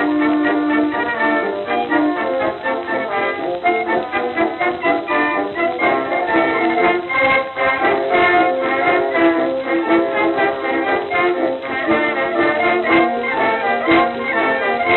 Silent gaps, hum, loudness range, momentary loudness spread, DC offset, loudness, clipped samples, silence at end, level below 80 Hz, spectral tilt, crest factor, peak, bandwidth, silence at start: none; none; 3 LU; 5 LU; under 0.1%; -17 LUFS; under 0.1%; 0 s; -54 dBFS; -7.5 dB/octave; 14 dB; -2 dBFS; 4.3 kHz; 0 s